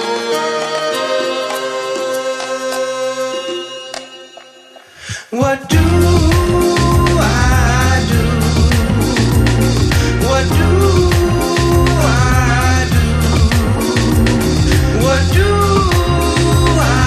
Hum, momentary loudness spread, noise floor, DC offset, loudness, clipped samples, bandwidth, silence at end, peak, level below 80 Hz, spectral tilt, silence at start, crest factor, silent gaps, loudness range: none; 8 LU; -40 dBFS; under 0.1%; -13 LUFS; under 0.1%; 15 kHz; 0 s; 0 dBFS; -18 dBFS; -5.5 dB/octave; 0 s; 12 dB; none; 7 LU